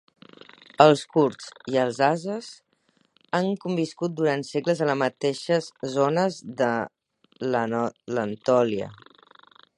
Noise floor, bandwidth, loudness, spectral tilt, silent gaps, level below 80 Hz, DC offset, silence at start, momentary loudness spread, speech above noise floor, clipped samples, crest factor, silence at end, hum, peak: -67 dBFS; 11.5 kHz; -24 LUFS; -6 dB/octave; none; -70 dBFS; under 0.1%; 0.8 s; 11 LU; 43 dB; under 0.1%; 24 dB; 0.8 s; none; -2 dBFS